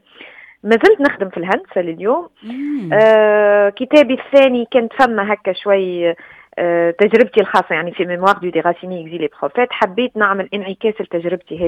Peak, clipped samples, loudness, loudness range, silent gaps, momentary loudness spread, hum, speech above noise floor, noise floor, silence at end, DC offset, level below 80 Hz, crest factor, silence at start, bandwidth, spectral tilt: 0 dBFS; under 0.1%; -15 LUFS; 5 LU; none; 12 LU; none; 25 dB; -40 dBFS; 0 s; under 0.1%; -58 dBFS; 14 dB; 0.2 s; 9.6 kHz; -6.5 dB/octave